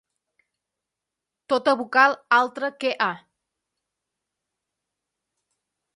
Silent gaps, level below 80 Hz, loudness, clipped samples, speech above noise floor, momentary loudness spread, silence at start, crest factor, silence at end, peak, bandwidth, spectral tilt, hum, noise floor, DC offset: none; -80 dBFS; -21 LUFS; under 0.1%; 64 dB; 9 LU; 1.5 s; 24 dB; 2.8 s; -4 dBFS; 11.5 kHz; -3.5 dB/octave; none; -86 dBFS; under 0.1%